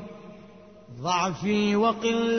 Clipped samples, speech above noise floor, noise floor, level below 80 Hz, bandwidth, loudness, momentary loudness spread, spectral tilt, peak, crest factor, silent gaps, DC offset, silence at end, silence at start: under 0.1%; 25 dB; -49 dBFS; -60 dBFS; 6.6 kHz; -25 LUFS; 23 LU; -5 dB/octave; -12 dBFS; 16 dB; none; under 0.1%; 0 s; 0 s